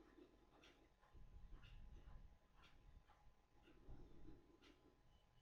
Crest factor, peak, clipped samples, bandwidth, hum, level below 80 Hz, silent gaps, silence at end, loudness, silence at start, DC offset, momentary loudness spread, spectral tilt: 16 dB; -48 dBFS; under 0.1%; 6.8 kHz; none; -66 dBFS; none; 0 s; -67 LUFS; 0 s; under 0.1%; 3 LU; -5 dB/octave